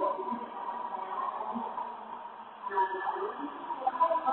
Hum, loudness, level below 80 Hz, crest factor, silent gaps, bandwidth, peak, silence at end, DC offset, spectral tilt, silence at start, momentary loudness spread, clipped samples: none; -35 LUFS; -78 dBFS; 18 dB; none; 4 kHz; -16 dBFS; 0 s; under 0.1%; -2 dB/octave; 0 s; 13 LU; under 0.1%